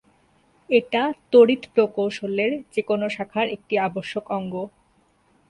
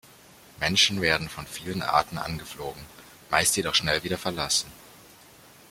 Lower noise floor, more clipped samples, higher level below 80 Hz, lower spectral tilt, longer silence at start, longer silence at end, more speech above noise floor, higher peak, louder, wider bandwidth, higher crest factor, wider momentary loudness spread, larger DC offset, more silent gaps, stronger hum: first, -62 dBFS vs -52 dBFS; neither; second, -66 dBFS vs -54 dBFS; first, -6 dB/octave vs -2 dB/octave; about the same, 0.7 s vs 0.6 s; about the same, 0.8 s vs 0.7 s; first, 41 dB vs 26 dB; about the same, -4 dBFS vs -4 dBFS; first, -22 LUFS vs -25 LUFS; second, 10.5 kHz vs 16.5 kHz; about the same, 20 dB vs 24 dB; second, 12 LU vs 16 LU; neither; neither; neither